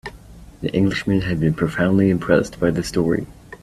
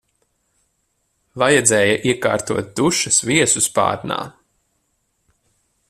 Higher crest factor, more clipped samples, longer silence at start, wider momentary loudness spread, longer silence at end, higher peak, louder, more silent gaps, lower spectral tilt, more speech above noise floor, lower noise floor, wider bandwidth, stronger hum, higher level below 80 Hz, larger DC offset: about the same, 18 dB vs 20 dB; neither; second, 0.05 s vs 1.35 s; second, 8 LU vs 12 LU; second, 0.05 s vs 1.6 s; about the same, -2 dBFS vs 0 dBFS; second, -20 LUFS vs -17 LUFS; neither; first, -7 dB/octave vs -3 dB/octave; second, 23 dB vs 51 dB; second, -41 dBFS vs -69 dBFS; second, 13 kHz vs 14.5 kHz; neither; first, -42 dBFS vs -56 dBFS; neither